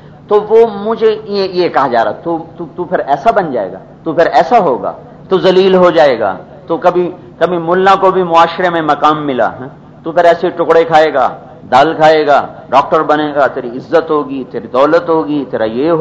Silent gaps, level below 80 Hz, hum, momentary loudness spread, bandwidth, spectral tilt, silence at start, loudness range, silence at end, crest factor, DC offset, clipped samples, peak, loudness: none; -48 dBFS; none; 12 LU; 7.8 kHz; -6.5 dB/octave; 0.05 s; 3 LU; 0 s; 10 dB; under 0.1%; 0.7%; 0 dBFS; -11 LUFS